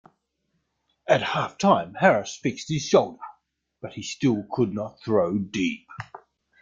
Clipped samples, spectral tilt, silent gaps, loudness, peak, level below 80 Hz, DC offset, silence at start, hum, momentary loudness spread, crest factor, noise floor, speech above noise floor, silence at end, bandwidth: under 0.1%; -5.5 dB/octave; none; -24 LUFS; -4 dBFS; -62 dBFS; under 0.1%; 1.05 s; none; 19 LU; 22 dB; -75 dBFS; 51 dB; 0.45 s; 7.8 kHz